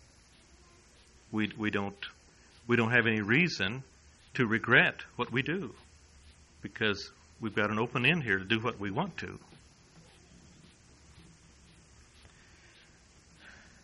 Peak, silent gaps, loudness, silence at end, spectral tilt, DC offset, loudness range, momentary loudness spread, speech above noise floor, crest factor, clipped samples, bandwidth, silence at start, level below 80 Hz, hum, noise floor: -10 dBFS; none; -30 LUFS; 0.3 s; -5.5 dB/octave; under 0.1%; 8 LU; 19 LU; 30 dB; 24 dB; under 0.1%; 11 kHz; 1.3 s; -62 dBFS; none; -60 dBFS